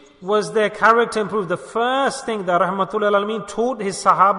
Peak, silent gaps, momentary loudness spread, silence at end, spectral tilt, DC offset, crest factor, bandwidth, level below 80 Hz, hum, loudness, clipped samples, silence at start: -2 dBFS; none; 8 LU; 0 s; -4.5 dB/octave; under 0.1%; 18 dB; 11 kHz; -58 dBFS; none; -19 LUFS; under 0.1%; 0.2 s